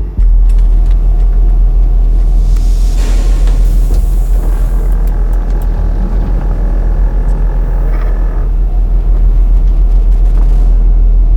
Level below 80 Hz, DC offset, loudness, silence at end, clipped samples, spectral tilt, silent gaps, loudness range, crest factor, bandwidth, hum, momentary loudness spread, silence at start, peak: -8 dBFS; under 0.1%; -13 LUFS; 0 s; under 0.1%; -7.5 dB/octave; none; 3 LU; 6 dB; 2.6 kHz; none; 4 LU; 0 s; -2 dBFS